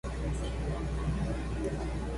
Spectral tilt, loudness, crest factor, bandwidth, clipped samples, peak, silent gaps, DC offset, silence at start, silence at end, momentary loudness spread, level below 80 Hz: -7 dB/octave; -35 LUFS; 12 dB; 11.5 kHz; under 0.1%; -20 dBFS; none; under 0.1%; 0.05 s; 0 s; 2 LU; -36 dBFS